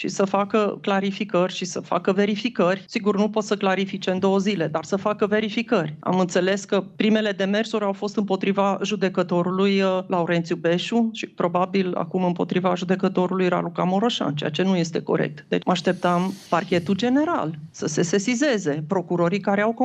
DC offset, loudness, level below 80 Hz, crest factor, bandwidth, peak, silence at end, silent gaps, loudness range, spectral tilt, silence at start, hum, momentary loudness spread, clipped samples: under 0.1%; -23 LUFS; -68 dBFS; 16 dB; 8.6 kHz; -6 dBFS; 0 s; none; 1 LU; -5.5 dB/octave; 0 s; none; 4 LU; under 0.1%